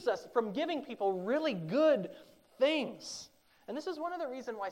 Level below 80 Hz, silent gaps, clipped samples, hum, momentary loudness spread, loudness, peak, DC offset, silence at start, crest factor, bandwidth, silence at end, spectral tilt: -80 dBFS; none; under 0.1%; none; 15 LU; -34 LUFS; -18 dBFS; under 0.1%; 0 s; 16 dB; 16 kHz; 0 s; -5 dB/octave